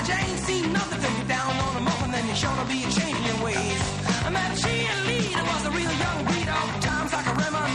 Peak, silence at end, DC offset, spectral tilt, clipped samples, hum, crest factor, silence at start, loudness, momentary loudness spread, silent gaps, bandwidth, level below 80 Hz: -10 dBFS; 0 s; under 0.1%; -4 dB/octave; under 0.1%; none; 16 dB; 0 s; -25 LUFS; 2 LU; none; 11 kHz; -42 dBFS